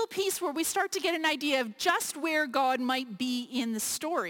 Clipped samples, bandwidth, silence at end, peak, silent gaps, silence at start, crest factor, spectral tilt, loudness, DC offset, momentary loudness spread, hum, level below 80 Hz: under 0.1%; 17 kHz; 0 s; -12 dBFS; none; 0 s; 18 dB; -1.5 dB/octave; -29 LUFS; under 0.1%; 4 LU; none; -74 dBFS